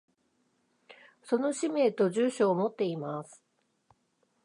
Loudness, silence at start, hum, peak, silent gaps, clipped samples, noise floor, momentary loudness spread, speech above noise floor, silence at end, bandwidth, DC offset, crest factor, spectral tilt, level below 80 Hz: -29 LUFS; 0.9 s; none; -14 dBFS; none; under 0.1%; -74 dBFS; 11 LU; 45 dB; 1.1 s; 11 kHz; under 0.1%; 18 dB; -6 dB/octave; -86 dBFS